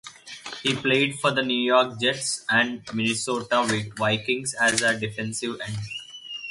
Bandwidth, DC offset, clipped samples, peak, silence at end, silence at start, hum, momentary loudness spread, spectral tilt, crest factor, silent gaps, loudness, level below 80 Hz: 11.5 kHz; under 0.1%; under 0.1%; -6 dBFS; 0 s; 0.05 s; none; 14 LU; -3 dB/octave; 20 dB; none; -23 LUFS; -62 dBFS